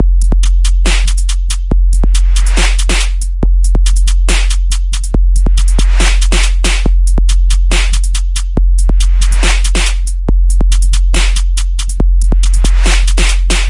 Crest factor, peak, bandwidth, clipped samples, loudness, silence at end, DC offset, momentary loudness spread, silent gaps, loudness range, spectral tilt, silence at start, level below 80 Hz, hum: 8 dB; 0 dBFS; 11.5 kHz; under 0.1%; -13 LUFS; 0 s; under 0.1%; 4 LU; none; 1 LU; -3.5 dB/octave; 0 s; -8 dBFS; none